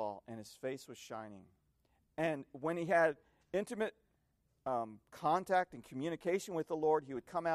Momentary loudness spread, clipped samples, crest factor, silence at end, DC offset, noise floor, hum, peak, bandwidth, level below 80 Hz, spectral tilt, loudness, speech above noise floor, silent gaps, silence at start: 15 LU; under 0.1%; 18 dB; 0 s; under 0.1%; -78 dBFS; none; -20 dBFS; 14.5 kHz; -76 dBFS; -5.5 dB/octave; -38 LUFS; 41 dB; none; 0 s